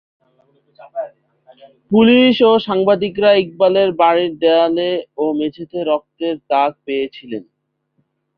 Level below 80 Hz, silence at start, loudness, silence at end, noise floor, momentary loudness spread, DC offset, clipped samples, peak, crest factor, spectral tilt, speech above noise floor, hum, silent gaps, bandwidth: -60 dBFS; 0.8 s; -15 LUFS; 0.95 s; -67 dBFS; 17 LU; under 0.1%; under 0.1%; -2 dBFS; 16 dB; -8 dB/octave; 52 dB; none; none; 5.4 kHz